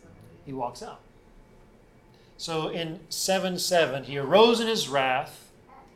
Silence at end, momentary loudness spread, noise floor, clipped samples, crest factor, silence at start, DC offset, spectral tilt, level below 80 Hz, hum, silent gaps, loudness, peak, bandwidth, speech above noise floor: 0.15 s; 19 LU; -55 dBFS; under 0.1%; 22 dB; 0.2 s; under 0.1%; -3.5 dB/octave; -60 dBFS; none; none; -25 LUFS; -6 dBFS; 16 kHz; 30 dB